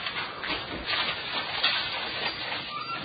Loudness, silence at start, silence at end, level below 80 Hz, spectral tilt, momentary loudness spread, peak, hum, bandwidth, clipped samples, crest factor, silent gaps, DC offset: -29 LUFS; 0 s; 0 s; -56 dBFS; -6.5 dB/octave; 7 LU; -8 dBFS; none; 5.2 kHz; under 0.1%; 22 dB; none; under 0.1%